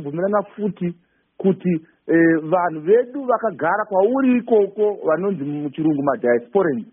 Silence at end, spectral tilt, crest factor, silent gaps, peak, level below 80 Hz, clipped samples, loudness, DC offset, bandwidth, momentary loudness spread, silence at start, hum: 0.1 s; -3.5 dB/octave; 14 dB; none; -4 dBFS; -66 dBFS; under 0.1%; -20 LUFS; under 0.1%; 3.6 kHz; 8 LU; 0 s; none